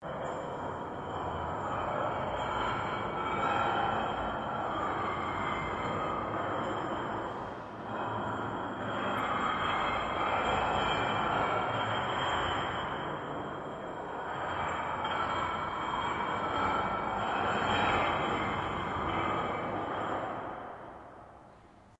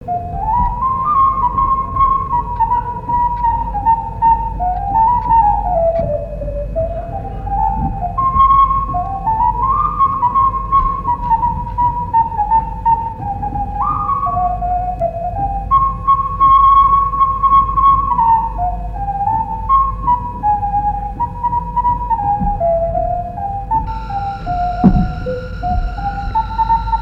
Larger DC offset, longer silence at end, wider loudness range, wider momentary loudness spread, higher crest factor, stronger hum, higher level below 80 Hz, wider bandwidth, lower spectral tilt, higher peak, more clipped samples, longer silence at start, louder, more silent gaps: neither; about the same, 0.05 s vs 0 s; about the same, 4 LU vs 6 LU; about the same, 9 LU vs 10 LU; about the same, 16 dB vs 14 dB; neither; second, -54 dBFS vs -26 dBFS; first, 11 kHz vs 5.8 kHz; second, -5.5 dB/octave vs -9.5 dB/octave; second, -16 dBFS vs 0 dBFS; neither; about the same, 0 s vs 0 s; second, -33 LUFS vs -15 LUFS; neither